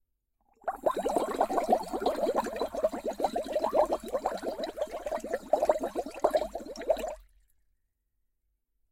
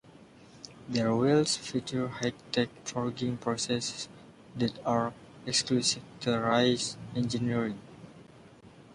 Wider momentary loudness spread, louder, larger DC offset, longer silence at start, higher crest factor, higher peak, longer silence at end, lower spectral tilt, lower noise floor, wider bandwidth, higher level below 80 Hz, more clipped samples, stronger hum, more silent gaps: second, 9 LU vs 17 LU; about the same, -31 LUFS vs -30 LUFS; neither; first, 0.65 s vs 0.05 s; about the same, 22 dB vs 20 dB; about the same, -10 dBFS vs -12 dBFS; first, 1.7 s vs 0 s; about the same, -4.5 dB/octave vs -4.5 dB/octave; first, -77 dBFS vs -54 dBFS; first, 16.5 kHz vs 11.5 kHz; first, -58 dBFS vs -64 dBFS; neither; neither; neither